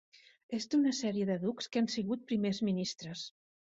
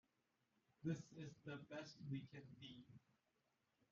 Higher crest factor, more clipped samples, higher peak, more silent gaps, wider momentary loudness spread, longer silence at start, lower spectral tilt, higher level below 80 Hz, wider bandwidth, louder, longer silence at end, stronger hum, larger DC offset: second, 14 dB vs 20 dB; neither; first, -20 dBFS vs -34 dBFS; neither; about the same, 11 LU vs 11 LU; second, 0.5 s vs 0.8 s; about the same, -5 dB/octave vs -6 dB/octave; first, -74 dBFS vs -86 dBFS; first, 8 kHz vs 7.2 kHz; first, -34 LUFS vs -54 LUFS; second, 0.5 s vs 0.95 s; neither; neither